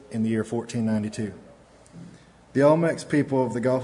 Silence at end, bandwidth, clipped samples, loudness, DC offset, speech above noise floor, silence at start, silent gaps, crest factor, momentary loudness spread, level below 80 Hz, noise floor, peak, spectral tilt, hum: 0 s; 11 kHz; under 0.1%; -24 LUFS; under 0.1%; 26 dB; 0.1 s; none; 20 dB; 11 LU; -62 dBFS; -50 dBFS; -6 dBFS; -7 dB/octave; none